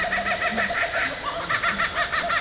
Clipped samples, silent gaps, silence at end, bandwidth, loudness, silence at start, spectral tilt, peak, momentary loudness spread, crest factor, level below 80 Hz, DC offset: under 0.1%; none; 0 s; 4 kHz; -23 LUFS; 0 s; -7 dB/octave; -10 dBFS; 3 LU; 16 dB; -48 dBFS; under 0.1%